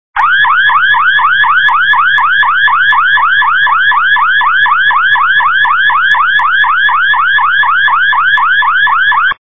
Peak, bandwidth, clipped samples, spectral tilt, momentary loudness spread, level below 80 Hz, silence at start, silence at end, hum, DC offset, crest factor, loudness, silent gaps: 0 dBFS; 8 kHz; under 0.1%; -1.5 dB/octave; 1 LU; -50 dBFS; 0.15 s; 0.05 s; none; 4%; 8 dB; -7 LUFS; none